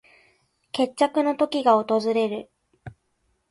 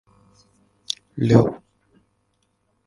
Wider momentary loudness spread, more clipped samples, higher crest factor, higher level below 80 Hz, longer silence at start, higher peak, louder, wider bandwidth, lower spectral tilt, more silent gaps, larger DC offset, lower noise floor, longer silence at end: second, 9 LU vs 15 LU; neither; about the same, 20 dB vs 24 dB; second, -64 dBFS vs -52 dBFS; second, 0.75 s vs 1.15 s; second, -6 dBFS vs 0 dBFS; second, -23 LUFS vs -20 LUFS; about the same, 11.5 kHz vs 11.5 kHz; second, -5 dB/octave vs -7 dB/octave; neither; neither; about the same, -71 dBFS vs -69 dBFS; second, 0.6 s vs 1.3 s